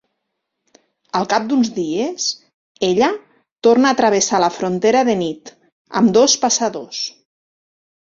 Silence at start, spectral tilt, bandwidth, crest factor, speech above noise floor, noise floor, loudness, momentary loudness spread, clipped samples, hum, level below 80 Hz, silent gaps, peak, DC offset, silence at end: 1.15 s; -3.5 dB/octave; 7.8 kHz; 16 dB; 60 dB; -76 dBFS; -17 LUFS; 12 LU; under 0.1%; none; -62 dBFS; 2.54-2.75 s, 3.52-3.56 s, 5.72-5.85 s; -2 dBFS; under 0.1%; 1 s